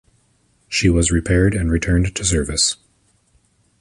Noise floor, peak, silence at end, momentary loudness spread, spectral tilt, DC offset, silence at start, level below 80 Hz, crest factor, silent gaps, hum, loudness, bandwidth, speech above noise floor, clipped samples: -60 dBFS; -4 dBFS; 1.05 s; 4 LU; -4 dB/octave; under 0.1%; 0.7 s; -28 dBFS; 16 dB; none; none; -18 LUFS; 11.5 kHz; 44 dB; under 0.1%